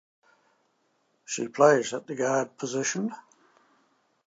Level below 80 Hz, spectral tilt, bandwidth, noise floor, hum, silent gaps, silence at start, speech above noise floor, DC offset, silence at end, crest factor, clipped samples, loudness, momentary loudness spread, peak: -84 dBFS; -4 dB/octave; 9.2 kHz; -71 dBFS; none; none; 1.3 s; 45 dB; under 0.1%; 1.05 s; 24 dB; under 0.1%; -26 LUFS; 14 LU; -4 dBFS